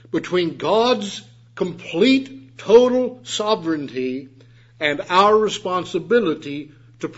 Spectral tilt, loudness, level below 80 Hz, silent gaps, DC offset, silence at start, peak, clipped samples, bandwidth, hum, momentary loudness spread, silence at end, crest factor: -4.5 dB/octave; -19 LUFS; -60 dBFS; none; under 0.1%; 0.15 s; 0 dBFS; under 0.1%; 8 kHz; none; 17 LU; 0.05 s; 18 dB